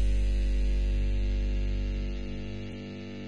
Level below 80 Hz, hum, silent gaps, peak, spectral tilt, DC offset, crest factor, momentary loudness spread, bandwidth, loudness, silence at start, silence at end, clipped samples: -28 dBFS; 50 Hz at -30 dBFS; none; -18 dBFS; -7 dB/octave; under 0.1%; 10 dB; 9 LU; 7.2 kHz; -32 LUFS; 0 s; 0 s; under 0.1%